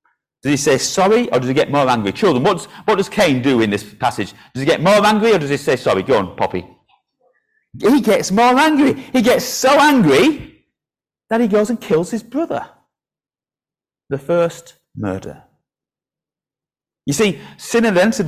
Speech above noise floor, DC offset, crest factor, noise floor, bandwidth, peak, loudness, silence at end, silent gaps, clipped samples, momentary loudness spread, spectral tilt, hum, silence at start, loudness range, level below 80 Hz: over 75 dB; under 0.1%; 14 dB; under -90 dBFS; 16 kHz; -4 dBFS; -15 LUFS; 0 s; none; under 0.1%; 13 LU; -4.5 dB/octave; none; 0.45 s; 11 LU; -50 dBFS